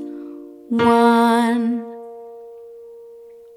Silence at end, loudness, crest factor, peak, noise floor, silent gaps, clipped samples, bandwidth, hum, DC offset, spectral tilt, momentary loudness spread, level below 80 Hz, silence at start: 0.4 s; -17 LUFS; 18 dB; -2 dBFS; -42 dBFS; none; under 0.1%; 14.5 kHz; none; under 0.1%; -5.5 dB/octave; 25 LU; -60 dBFS; 0 s